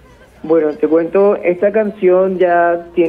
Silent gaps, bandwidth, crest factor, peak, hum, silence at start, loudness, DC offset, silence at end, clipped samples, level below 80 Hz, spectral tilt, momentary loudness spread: none; 4.9 kHz; 10 dB; -2 dBFS; none; 0.45 s; -13 LUFS; under 0.1%; 0 s; under 0.1%; -52 dBFS; -9 dB/octave; 3 LU